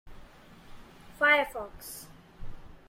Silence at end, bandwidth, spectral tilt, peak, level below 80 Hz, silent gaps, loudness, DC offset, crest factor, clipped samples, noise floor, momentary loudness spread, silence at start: 0.15 s; 16.5 kHz; -2.5 dB/octave; -10 dBFS; -50 dBFS; none; -26 LUFS; under 0.1%; 24 dB; under 0.1%; -52 dBFS; 28 LU; 0.05 s